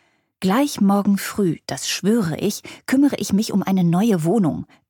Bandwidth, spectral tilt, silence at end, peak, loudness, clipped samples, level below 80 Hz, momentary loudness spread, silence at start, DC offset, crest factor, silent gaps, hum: 19 kHz; -5.5 dB/octave; 0.25 s; -6 dBFS; -20 LUFS; under 0.1%; -56 dBFS; 7 LU; 0.4 s; under 0.1%; 14 dB; none; none